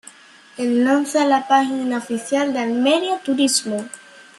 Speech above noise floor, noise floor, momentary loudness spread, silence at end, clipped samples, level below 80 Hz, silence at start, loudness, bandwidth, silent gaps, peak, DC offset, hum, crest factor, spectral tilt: 27 dB; -45 dBFS; 10 LU; 0.15 s; under 0.1%; -70 dBFS; 0.05 s; -19 LUFS; 13 kHz; none; -2 dBFS; under 0.1%; none; 16 dB; -2.5 dB/octave